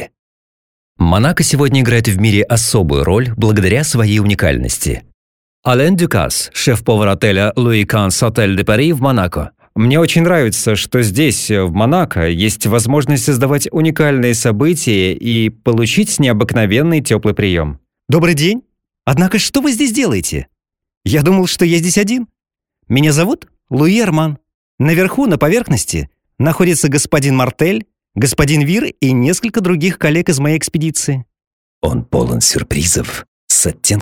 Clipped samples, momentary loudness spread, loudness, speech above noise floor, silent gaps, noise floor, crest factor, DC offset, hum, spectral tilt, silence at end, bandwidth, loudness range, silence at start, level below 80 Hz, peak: under 0.1%; 7 LU; -13 LUFS; over 78 dB; 0.19-0.95 s, 5.14-5.63 s, 20.97-21.01 s, 24.54-24.78 s, 31.47-31.82 s, 33.28-33.47 s; under -90 dBFS; 14 dB; under 0.1%; none; -5 dB/octave; 0 s; 17.5 kHz; 2 LU; 0 s; -34 dBFS; 0 dBFS